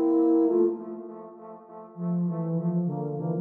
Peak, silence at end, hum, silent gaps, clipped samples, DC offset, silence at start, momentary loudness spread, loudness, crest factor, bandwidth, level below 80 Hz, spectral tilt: -12 dBFS; 0 s; none; none; under 0.1%; under 0.1%; 0 s; 22 LU; -26 LUFS; 14 dB; 2 kHz; -76 dBFS; -13.5 dB/octave